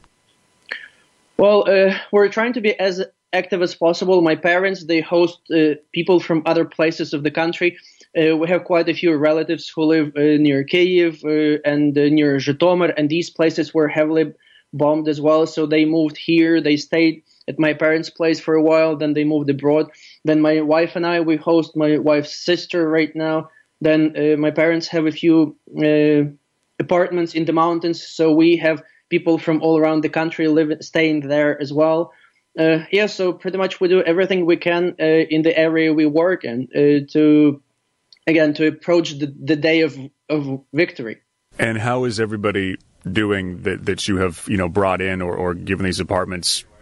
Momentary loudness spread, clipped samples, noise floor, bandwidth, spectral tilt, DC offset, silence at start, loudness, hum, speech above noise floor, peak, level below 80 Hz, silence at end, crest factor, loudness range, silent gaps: 8 LU; under 0.1%; -61 dBFS; 12 kHz; -6 dB/octave; under 0.1%; 0.7 s; -18 LUFS; none; 44 dB; -4 dBFS; -56 dBFS; 0.2 s; 14 dB; 4 LU; none